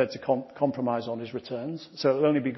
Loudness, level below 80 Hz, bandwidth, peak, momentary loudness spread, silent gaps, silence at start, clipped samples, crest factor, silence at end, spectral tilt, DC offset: -28 LUFS; -70 dBFS; 6 kHz; -10 dBFS; 11 LU; none; 0 s; under 0.1%; 16 dB; 0 s; -7.5 dB/octave; under 0.1%